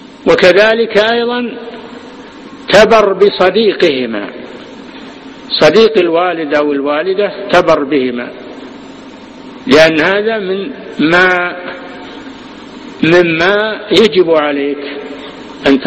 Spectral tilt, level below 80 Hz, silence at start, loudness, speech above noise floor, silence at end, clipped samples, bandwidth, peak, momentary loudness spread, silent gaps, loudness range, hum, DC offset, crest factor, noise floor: -5 dB/octave; -46 dBFS; 0.15 s; -10 LUFS; 22 dB; 0 s; 0.6%; 11.5 kHz; 0 dBFS; 23 LU; none; 3 LU; none; under 0.1%; 12 dB; -31 dBFS